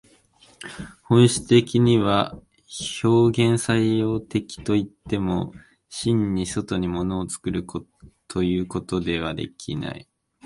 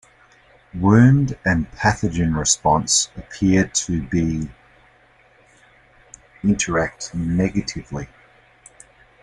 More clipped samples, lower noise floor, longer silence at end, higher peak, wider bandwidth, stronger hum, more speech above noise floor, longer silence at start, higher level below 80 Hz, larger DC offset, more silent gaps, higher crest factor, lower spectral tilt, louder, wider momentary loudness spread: neither; about the same, -56 dBFS vs -54 dBFS; second, 0.45 s vs 1.2 s; about the same, -4 dBFS vs -2 dBFS; about the same, 11.5 kHz vs 11.5 kHz; neither; about the same, 34 dB vs 35 dB; second, 0.6 s vs 0.75 s; about the same, -46 dBFS vs -42 dBFS; neither; neither; about the same, 20 dB vs 18 dB; first, -6 dB/octave vs -4.5 dB/octave; second, -23 LUFS vs -19 LUFS; first, 18 LU vs 14 LU